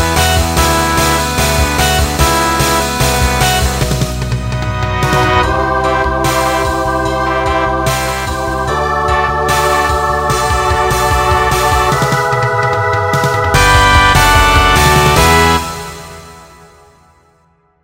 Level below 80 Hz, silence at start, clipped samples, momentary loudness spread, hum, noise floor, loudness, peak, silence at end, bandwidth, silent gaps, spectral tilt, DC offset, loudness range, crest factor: -20 dBFS; 0 s; under 0.1%; 8 LU; none; -53 dBFS; -11 LUFS; 0 dBFS; 1.4 s; 16.5 kHz; none; -4 dB/octave; under 0.1%; 5 LU; 12 dB